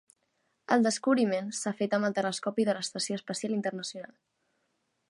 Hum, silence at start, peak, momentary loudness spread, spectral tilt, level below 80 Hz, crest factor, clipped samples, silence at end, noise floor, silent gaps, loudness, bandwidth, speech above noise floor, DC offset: none; 0.7 s; -10 dBFS; 10 LU; -4 dB/octave; -82 dBFS; 20 dB; under 0.1%; 1.05 s; -77 dBFS; none; -30 LUFS; 11.5 kHz; 48 dB; under 0.1%